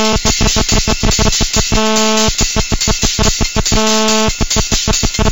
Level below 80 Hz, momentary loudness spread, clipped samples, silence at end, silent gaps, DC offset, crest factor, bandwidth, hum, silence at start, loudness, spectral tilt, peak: -20 dBFS; 3 LU; under 0.1%; 0 s; none; 3%; 12 dB; 17 kHz; none; 0 s; -12 LUFS; -3 dB/octave; 0 dBFS